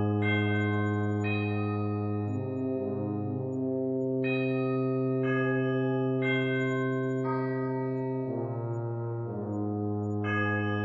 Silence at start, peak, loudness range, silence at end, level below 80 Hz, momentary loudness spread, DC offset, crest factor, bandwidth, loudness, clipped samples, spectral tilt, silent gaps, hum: 0 s; -16 dBFS; 3 LU; 0 s; -72 dBFS; 6 LU; under 0.1%; 12 dB; 7.4 kHz; -30 LUFS; under 0.1%; -9 dB/octave; none; none